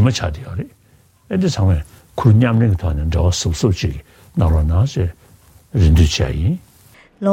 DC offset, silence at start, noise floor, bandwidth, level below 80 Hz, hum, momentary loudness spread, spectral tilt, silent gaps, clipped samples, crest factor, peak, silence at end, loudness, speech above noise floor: under 0.1%; 0 s; -52 dBFS; 12 kHz; -24 dBFS; none; 14 LU; -6.5 dB/octave; none; under 0.1%; 16 dB; 0 dBFS; 0 s; -17 LUFS; 37 dB